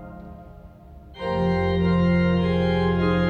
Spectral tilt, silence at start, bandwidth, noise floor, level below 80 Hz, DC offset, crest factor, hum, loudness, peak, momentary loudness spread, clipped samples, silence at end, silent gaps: -9 dB/octave; 0 s; 5 kHz; -44 dBFS; -38 dBFS; under 0.1%; 12 dB; none; -22 LUFS; -10 dBFS; 19 LU; under 0.1%; 0 s; none